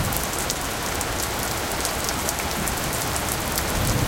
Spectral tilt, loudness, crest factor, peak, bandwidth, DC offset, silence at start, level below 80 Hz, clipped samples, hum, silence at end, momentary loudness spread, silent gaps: -3 dB/octave; -24 LUFS; 24 dB; 0 dBFS; 17.5 kHz; under 0.1%; 0 s; -36 dBFS; under 0.1%; none; 0 s; 2 LU; none